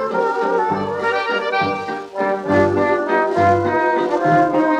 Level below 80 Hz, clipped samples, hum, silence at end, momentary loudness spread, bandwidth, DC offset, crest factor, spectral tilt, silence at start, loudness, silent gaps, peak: -56 dBFS; under 0.1%; none; 0 s; 6 LU; 10.5 kHz; under 0.1%; 14 dB; -6.5 dB/octave; 0 s; -18 LUFS; none; -4 dBFS